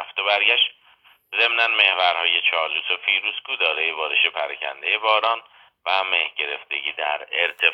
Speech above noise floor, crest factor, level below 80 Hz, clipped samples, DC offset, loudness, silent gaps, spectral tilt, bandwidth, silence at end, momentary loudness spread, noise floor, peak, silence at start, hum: 34 dB; 20 dB; -80 dBFS; under 0.1%; under 0.1%; -20 LUFS; none; -1 dB/octave; 12 kHz; 0 s; 10 LU; -55 dBFS; -2 dBFS; 0 s; none